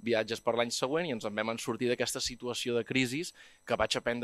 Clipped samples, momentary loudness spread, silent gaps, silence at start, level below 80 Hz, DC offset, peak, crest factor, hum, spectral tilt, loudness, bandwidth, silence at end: under 0.1%; 5 LU; none; 0 s; -62 dBFS; under 0.1%; -12 dBFS; 20 dB; none; -3.5 dB/octave; -32 LUFS; 15.5 kHz; 0 s